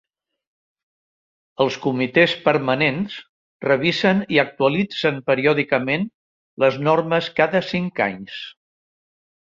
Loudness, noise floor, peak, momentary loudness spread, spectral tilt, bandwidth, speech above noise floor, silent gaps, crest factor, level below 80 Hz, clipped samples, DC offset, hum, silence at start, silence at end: -20 LUFS; under -90 dBFS; -2 dBFS; 12 LU; -6.5 dB/octave; 7.6 kHz; over 70 dB; 3.29-3.60 s, 6.14-6.57 s; 20 dB; -60 dBFS; under 0.1%; under 0.1%; none; 1.6 s; 1.05 s